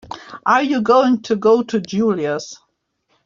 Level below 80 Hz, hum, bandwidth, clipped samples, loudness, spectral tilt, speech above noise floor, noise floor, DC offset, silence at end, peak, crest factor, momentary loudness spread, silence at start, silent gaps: -60 dBFS; none; 7.6 kHz; under 0.1%; -17 LUFS; -5.5 dB/octave; 51 dB; -67 dBFS; under 0.1%; 0.7 s; -2 dBFS; 16 dB; 11 LU; 0.05 s; none